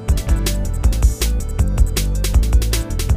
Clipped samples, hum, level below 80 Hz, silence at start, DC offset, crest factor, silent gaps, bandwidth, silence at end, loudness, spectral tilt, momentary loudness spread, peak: under 0.1%; none; -16 dBFS; 0 s; under 0.1%; 14 dB; none; 16 kHz; 0 s; -19 LUFS; -5 dB/octave; 4 LU; -2 dBFS